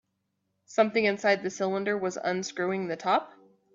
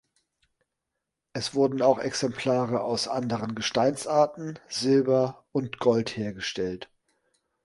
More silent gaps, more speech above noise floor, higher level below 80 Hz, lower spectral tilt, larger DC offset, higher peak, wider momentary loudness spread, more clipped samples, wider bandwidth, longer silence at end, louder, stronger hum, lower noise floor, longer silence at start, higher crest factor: neither; second, 51 dB vs 58 dB; second, -76 dBFS vs -64 dBFS; about the same, -4.5 dB/octave vs -5 dB/octave; neither; second, -10 dBFS vs -6 dBFS; second, 6 LU vs 10 LU; neither; second, 7.8 kHz vs 11.5 kHz; second, 0.45 s vs 0.8 s; about the same, -28 LUFS vs -26 LUFS; neither; second, -79 dBFS vs -84 dBFS; second, 0.7 s vs 1.35 s; about the same, 20 dB vs 20 dB